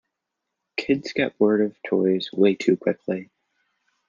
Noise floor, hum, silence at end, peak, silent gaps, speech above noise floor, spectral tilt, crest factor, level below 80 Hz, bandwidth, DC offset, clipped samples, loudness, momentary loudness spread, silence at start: -82 dBFS; none; 0.85 s; -6 dBFS; none; 60 dB; -6.5 dB/octave; 18 dB; -66 dBFS; 7.4 kHz; under 0.1%; under 0.1%; -23 LUFS; 10 LU; 0.75 s